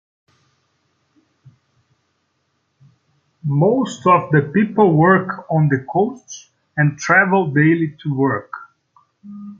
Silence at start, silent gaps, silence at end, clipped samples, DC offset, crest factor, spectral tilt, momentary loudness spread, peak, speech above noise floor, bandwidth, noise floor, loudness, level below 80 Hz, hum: 3.45 s; none; 0.05 s; under 0.1%; under 0.1%; 18 dB; -7.5 dB/octave; 21 LU; -2 dBFS; 52 dB; 7.6 kHz; -68 dBFS; -16 LUFS; -62 dBFS; none